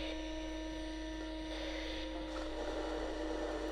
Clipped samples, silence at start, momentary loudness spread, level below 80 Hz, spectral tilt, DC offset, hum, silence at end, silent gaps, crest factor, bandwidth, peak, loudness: under 0.1%; 0 s; 3 LU; -48 dBFS; -4.5 dB/octave; under 0.1%; none; 0 s; none; 14 dB; 12 kHz; -28 dBFS; -42 LUFS